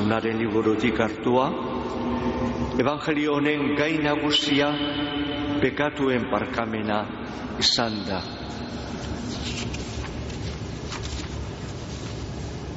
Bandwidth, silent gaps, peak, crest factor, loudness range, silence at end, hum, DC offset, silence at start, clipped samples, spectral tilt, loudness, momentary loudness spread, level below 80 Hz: 8 kHz; none; -8 dBFS; 18 dB; 9 LU; 0 s; none; under 0.1%; 0 s; under 0.1%; -3.5 dB/octave; -26 LUFS; 12 LU; -42 dBFS